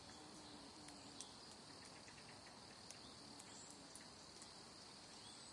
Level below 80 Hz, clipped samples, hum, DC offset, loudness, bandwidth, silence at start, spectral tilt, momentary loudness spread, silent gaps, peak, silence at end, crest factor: -80 dBFS; under 0.1%; none; under 0.1%; -57 LUFS; 12 kHz; 0 s; -2 dB/octave; 3 LU; none; -34 dBFS; 0 s; 24 dB